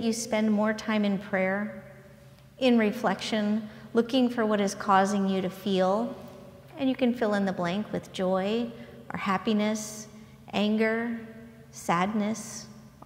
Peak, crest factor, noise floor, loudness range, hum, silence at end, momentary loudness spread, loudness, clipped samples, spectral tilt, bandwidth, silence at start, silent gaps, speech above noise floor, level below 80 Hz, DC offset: -8 dBFS; 20 dB; -52 dBFS; 4 LU; none; 0 s; 17 LU; -28 LUFS; under 0.1%; -5 dB/octave; 16 kHz; 0 s; none; 25 dB; -64 dBFS; under 0.1%